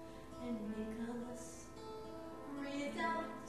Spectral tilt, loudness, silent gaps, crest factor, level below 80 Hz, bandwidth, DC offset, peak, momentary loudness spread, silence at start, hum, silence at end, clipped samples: -5 dB/octave; -45 LUFS; none; 20 dB; -64 dBFS; 13 kHz; 0.1%; -26 dBFS; 11 LU; 0 s; none; 0 s; under 0.1%